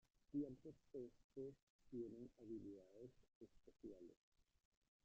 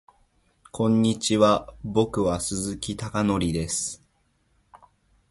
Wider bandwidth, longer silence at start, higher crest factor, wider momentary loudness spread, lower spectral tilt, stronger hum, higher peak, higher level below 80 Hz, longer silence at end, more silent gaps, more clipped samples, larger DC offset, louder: second, 8 kHz vs 11.5 kHz; second, 0.3 s vs 0.75 s; about the same, 20 dB vs 20 dB; first, 17 LU vs 10 LU; first, -10.5 dB/octave vs -5 dB/octave; neither; second, -38 dBFS vs -6 dBFS; second, -80 dBFS vs -48 dBFS; about the same, 0.65 s vs 0.55 s; first, 1.24-1.30 s, 1.63-1.79 s, 3.35-3.41 s, 4.17-4.32 s vs none; neither; neither; second, -57 LUFS vs -24 LUFS